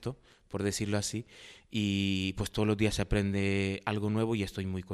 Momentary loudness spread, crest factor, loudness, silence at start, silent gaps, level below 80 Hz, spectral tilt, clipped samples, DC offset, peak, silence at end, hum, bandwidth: 12 LU; 18 dB; -32 LUFS; 0 s; none; -48 dBFS; -5.5 dB/octave; under 0.1%; under 0.1%; -14 dBFS; 0 s; none; 13.5 kHz